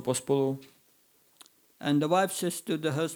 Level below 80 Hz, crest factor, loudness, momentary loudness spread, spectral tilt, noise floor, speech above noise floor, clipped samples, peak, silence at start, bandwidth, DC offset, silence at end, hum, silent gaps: -80 dBFS; 18 dB; -29 LUFS; 7 LU; -5 dB/octave; -65 dBFS; 37 dB; under 0.1%; -12 dBFS; 0 s; over 20 kHz; under 0.1%; 0 s; none; none